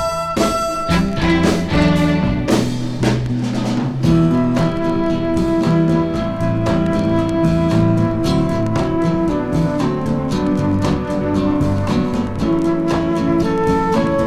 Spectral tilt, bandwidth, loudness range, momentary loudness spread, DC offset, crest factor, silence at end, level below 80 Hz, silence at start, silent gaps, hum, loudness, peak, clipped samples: -7 dB/octave; 13.5 kHz; 1 LU; 4 LU; under 0.1%; 16 dB; 0 s; -32 dBFS; 0 s; none; none; -17 LUFS; 0 dBFS; under 0.1%